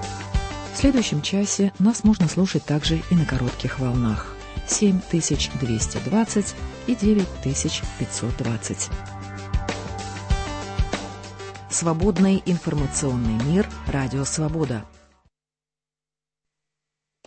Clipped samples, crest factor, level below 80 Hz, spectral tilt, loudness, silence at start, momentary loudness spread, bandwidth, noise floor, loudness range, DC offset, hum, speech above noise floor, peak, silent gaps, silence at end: under 0.1%; 18 dB; -34 dBFS; -5 dB/octave; -23 LUFS; 0 s; 11 LU; 8.8 kHz; under -90 dBFS; 7 LU; under 0.1%; none; over 68 dB; -6 dBFS; none; 2.4 s